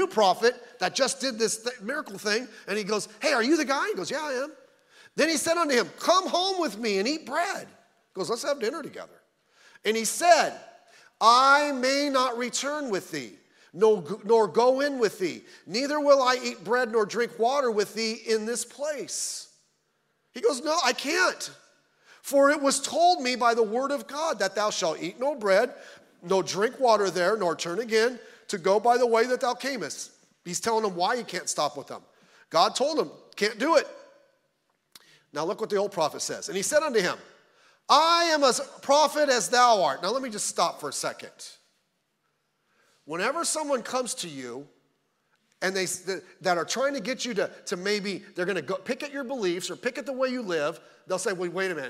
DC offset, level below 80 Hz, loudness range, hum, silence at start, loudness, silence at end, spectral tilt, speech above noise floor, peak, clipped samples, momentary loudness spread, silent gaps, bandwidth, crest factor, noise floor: under 0.1%; -82 dBFS; 7 LU; none; 0 s; -26 LUFS; 0 s; -2.5 dB/octave; 49 dB; -4 dBFS; under 0.1%; 12 LU; none; 16 kHz; 22 dB; -75 dBFS